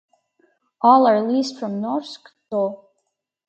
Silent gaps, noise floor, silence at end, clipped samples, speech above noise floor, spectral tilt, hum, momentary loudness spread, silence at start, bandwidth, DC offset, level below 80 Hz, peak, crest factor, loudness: none; -75 dBFS; 0.7 s; under 0.1%; 56 dB; -6 dB/octave; none; 14 LU; 0.85 s; 8.6 kHz; under 0.1%; -76 dBFS; -2 dBFS; 20 dB; -19 LUFS